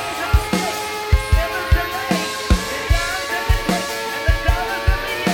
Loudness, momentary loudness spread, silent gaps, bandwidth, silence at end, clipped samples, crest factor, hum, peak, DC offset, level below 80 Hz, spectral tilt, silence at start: -20 LUFS; 3 LU; none; 17.5 kHz; 0 s; under 0.1%; 16 dB; none; -2 dBFS; under 0.1%; -22 dBFS; -4.5 dB/octave; 0 s